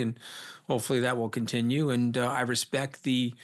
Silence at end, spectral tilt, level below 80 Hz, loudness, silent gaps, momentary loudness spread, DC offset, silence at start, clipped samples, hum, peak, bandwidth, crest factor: 0 s; -5 dB/octave; -74 dBFS; -29 LUFS; none; 7 LU; under 0.1%; 0 s; under 0.1%; none; -14 dBFS; 12.5 kHz; 14 dB